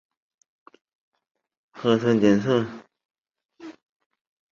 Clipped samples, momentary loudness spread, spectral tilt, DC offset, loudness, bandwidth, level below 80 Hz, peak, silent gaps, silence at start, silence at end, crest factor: under 0.1%; 25 LU; -7 dB/octave; under 0.1%; -22 LUFS; 7.2 kHz; -64 dBFS; -6 dBFS; none; 1.75 s; 0.8 s; 22 dB